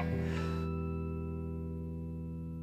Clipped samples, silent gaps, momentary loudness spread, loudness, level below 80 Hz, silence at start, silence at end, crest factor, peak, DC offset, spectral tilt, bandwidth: under 0.1%; none; 7 LU; -38 LUFS; -46 dBFS; 0 s; 0 s; 14 dB; -24 dBFS; under 0.1%; -8.5 dB/octave; 8.4 kHz